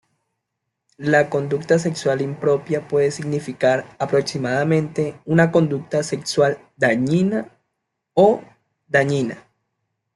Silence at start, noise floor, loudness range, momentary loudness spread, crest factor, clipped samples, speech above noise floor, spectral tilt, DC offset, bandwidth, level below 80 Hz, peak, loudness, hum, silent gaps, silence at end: 1 s; -79 dBFS; 2 LU; 9 LU; 18 dB; under 0.1%; 60 dB; -6 dB/octave; under 0.1%; 12 kHz; -60 dBFS; -2 dBFS; -20 LUFS; none; none; 0.75 s